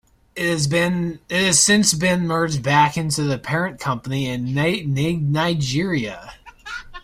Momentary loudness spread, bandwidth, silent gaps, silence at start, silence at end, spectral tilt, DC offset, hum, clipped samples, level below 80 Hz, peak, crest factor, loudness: 14 LU; 16 kHz; none; 0.35 s; 0.05 s; -4 dB/octave; under 0.1%; none; under 0.1%; -48 dBFS; 0 dBFS; 20 dB; -19 LUFS